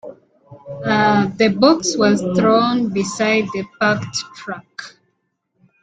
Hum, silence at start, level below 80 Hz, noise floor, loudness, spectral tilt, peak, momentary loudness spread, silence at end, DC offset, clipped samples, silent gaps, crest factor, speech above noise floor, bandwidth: none; 0.05 s; -56 dBFS; -70 dBFS; -17 LUFS; -4.5 dB/octave; -2 dBFS; 16 LU; 0.95 s; under 0.1%; under 0.1%; none; 16 dB; 53 dB; 9.4 kHz